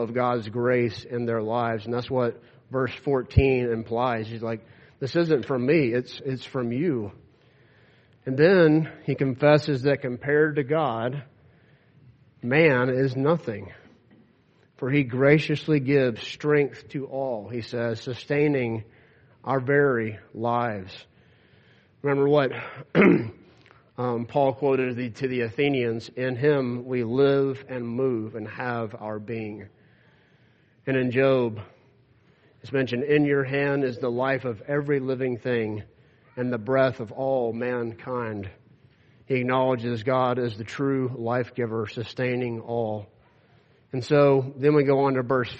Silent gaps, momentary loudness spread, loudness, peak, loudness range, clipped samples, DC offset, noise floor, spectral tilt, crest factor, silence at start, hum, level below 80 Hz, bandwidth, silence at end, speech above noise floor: none; 13 LU; -25 LUFS; -4 dBFS; 4 LU; under 0.1%; under 0.1%; -61 dBFS; -8 dB/octave; 22 dB; 0 s; none; -52 dBFS; 8.2 kHz; 0 s; 37 dB